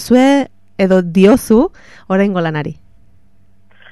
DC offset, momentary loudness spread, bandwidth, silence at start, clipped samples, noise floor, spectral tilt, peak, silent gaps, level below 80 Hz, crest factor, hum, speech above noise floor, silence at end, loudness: 0.8%; 11 LU; 13.5 kHz; 0 s; under 0.1%; -53 dBFS; -6.5 dB/octave; 0 dBFS; none; -42 dBFS; 14 dB; none; 42 dB; 1.2 s; -13 LUFS